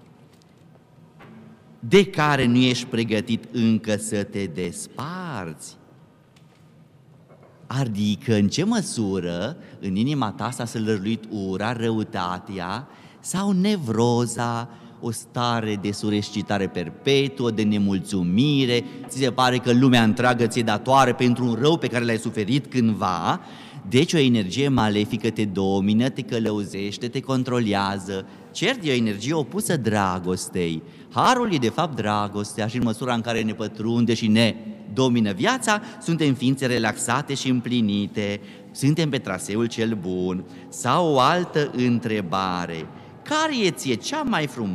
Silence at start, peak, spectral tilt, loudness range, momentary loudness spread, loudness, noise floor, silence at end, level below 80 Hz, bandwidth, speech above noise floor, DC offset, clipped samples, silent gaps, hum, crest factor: 1.2 s; -6 dBFS; -5.5 dB/octave; 6 LU; 11 LU; -23 LUFS; -53 dBFS; 0 s; -58 dBFS; 14.5 kHz; 31 dB; under 0.1%; under 0.1%; none; none; 18 dB